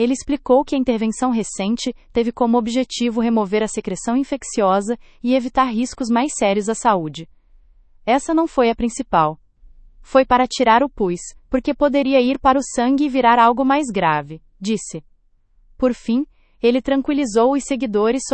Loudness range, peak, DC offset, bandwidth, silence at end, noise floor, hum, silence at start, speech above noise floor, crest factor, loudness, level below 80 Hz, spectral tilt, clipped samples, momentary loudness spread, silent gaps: 4 LU; 0 dBFS; under 0.1%; 8.8 kHz; 0 s; -56 dBFS; none; 0 s; 38 dB; 18 dB; -18 LUFS; -44 dBFS; -4.5 dB/octave; under 0.1%; 9 LU; none